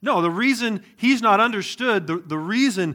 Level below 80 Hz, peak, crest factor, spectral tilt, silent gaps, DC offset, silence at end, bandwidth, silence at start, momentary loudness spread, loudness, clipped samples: -70 dBFS; -4 dBFS; 16 dB; -4.5 dB/octave; none; under 0.1%; 0 s; 17 kHz; 0 s; 8 LU; -20 LUFS; under 0.1%